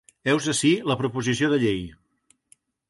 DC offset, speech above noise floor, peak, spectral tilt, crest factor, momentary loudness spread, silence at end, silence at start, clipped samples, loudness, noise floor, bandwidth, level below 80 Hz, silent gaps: under 0.1%; 43 dB; -8 dBFS; -4.5 dB/octave; 16 dB; 6 LU; 0.95 s; 0.25 s; under 0.1%; -23 LUFS; -66 dBFS; 11.5 kHz; -54 dBFS; none